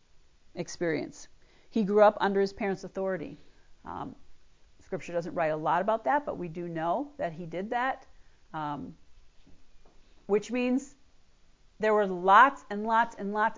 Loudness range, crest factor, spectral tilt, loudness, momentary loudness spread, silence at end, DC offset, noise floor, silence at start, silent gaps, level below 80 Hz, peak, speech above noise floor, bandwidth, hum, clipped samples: 9 LU; 22 dB; -5.5 dB/octave; -28 LUFS; 18 LU; 0 s; under 0.1%; -58 dBFS; 0.15 s; none; -62 dBFS; -6 dBFS; 30 dB; 7.6 kHz; none; under 0.1%